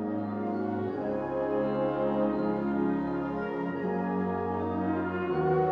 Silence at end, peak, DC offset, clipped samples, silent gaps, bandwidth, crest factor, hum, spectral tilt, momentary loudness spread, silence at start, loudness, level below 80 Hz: 0 s; -16 dBFS; under 0.1%; under 0.1%; none; 6 kHz; 14 dB; none; -10 dB/octave; 4 LU; 0 s; -30 LUFS; -56 dBFS